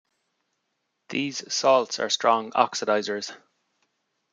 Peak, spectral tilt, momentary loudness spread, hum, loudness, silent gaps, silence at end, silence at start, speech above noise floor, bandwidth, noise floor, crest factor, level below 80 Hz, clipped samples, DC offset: -2 dBFS; -2.5 dB/octave; 11 LU; none; -24 LUFS; none; 0.95 s; 1.1 s; 53 dB; 9.4 kHz; -77 dBFS; 24 dB; -80 dBFS; under 0.1%; under 0.1%